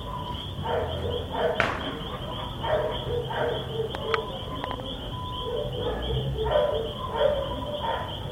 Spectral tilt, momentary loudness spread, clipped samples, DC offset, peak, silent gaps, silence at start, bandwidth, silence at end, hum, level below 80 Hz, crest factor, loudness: -6 dB/octave; 8 LU; under 0.1%; under 0.1%; -4 dBFS; none; 0 s; 16.5 kHz; 0 s; none; -40 dBFS; 26 dB; -29 LUFS